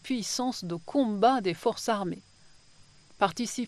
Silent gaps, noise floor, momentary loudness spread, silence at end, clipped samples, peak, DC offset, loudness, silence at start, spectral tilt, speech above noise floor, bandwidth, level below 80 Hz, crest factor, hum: none; -59 dBFS; 10 LU; 0 s; under 0.1%; -10 dBFS; under 0.1%; -29 LUFS; 0.05 s; -4 dB/octave; 30 dB; 13 kHz; -66 dBFS; 20 dB; none